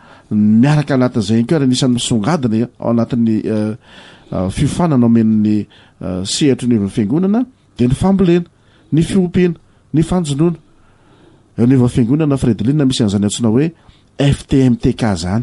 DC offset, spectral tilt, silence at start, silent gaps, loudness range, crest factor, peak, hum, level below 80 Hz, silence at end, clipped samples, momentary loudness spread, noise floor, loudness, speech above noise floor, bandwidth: under 0.1%; -6.5 dB/octave; 0.3 s; none; 2 LU; 12 dB; -2 dBFS; none; -38 dBFS; 0 s; under 0.1%; 9 LU; -47 dBFS; -15 LUFS; 34 dB; 11.5 kHz